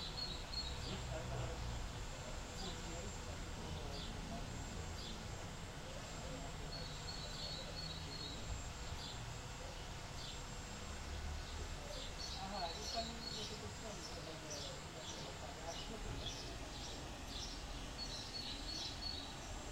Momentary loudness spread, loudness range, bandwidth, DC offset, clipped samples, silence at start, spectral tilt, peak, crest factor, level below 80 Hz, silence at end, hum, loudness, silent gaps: 5 LU; 2 LU; 16 kHz; under 0.1%; under 0.1%; 0 s; -3.5 dB/octave; -30 dBFS; 18 dB; -52 dBFS; 0 s; none; -47 LUFS; none